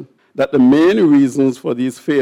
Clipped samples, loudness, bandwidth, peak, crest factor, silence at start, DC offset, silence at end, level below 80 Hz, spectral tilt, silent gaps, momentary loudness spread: under 0.1%; -13 LUFS; 12 kHz; -4 dBFS; 10 dB; 0 s; under 0.1%; 0 s; -56 dBFS; -6.5 dB/octave; none; 10 LU